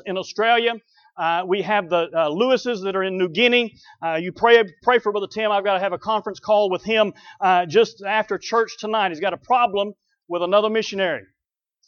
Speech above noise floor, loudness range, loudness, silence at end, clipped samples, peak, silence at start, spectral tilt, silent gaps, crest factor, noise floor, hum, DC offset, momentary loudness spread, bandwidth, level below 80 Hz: 65 dB; 2 LU; -20 LUFS; 0.65 s; under 0.1%; -2 dBFS; 0.05 s; -4.5 dB/octave; none; 18 dB; -85 dBFS; none; under 0.1%; 9 LU; 7 kHz; -66 dBFS